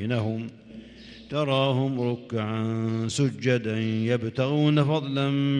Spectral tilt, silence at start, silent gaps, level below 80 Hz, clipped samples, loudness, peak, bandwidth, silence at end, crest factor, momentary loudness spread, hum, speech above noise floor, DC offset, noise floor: -6.5 dB/octave; 0 s; none; -62 dBFS; under 0.1%; -26 LUFS; -10 dBFS; 10.5 kHz; 0 s; 16 dB; 16 LU; none; 21 dB; under 0.1%; -46 dBFS